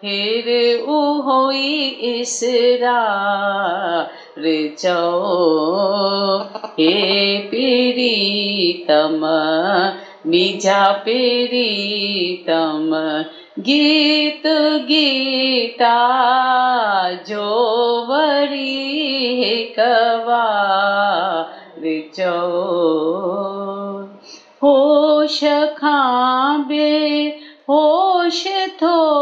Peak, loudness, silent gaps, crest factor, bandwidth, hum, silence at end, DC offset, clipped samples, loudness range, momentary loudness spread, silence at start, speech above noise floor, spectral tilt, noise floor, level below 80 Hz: -2 dBFS; -16 LUFS; none; 14 dB; 9.6 kHz; none; 0 s; under 0.1%; under 0.1%; 3 LU; 8 LU; 0 s; 25 dB; -3.5 dB/octave; -41 dBFS; -78 dBFS